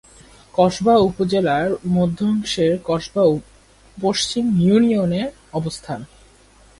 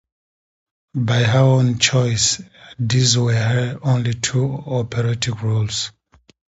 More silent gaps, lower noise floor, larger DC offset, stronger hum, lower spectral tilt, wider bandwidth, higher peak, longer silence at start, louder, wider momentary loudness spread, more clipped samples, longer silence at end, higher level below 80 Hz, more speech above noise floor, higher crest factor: neither; second, -50 dBFS vs under -90 dBFS; neither; neither; first, -6 dB/octave vs -4.5 dB/octave; first, 11.5 kHz vs 8 kHz; about the same, -2 dBFS vs -2 dBFS; second, 0.55 s vs 0.95 s; about the same, -19 LUFS vs -18 LUFS; about the same, 11 LU vs 9 LU; neither; about the same, 0.75 s vs 0.7 s; about the same, -48 dBFS vs -48 dBFS; second, 32 dB vs over 72 dB; about the same, 16 dB vs 16 dB